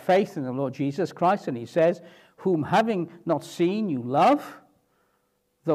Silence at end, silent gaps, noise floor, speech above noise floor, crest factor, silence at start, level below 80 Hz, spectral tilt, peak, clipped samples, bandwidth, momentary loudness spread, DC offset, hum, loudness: 0 s; none; -71 dBFS; 47 dB; 16 dB; 0 s; -74 dBFS; -7 dB/octave; -10 dBFS; under 0.1%; 15 kHz; 8 LU; under 0.1%; none; -25 LUFS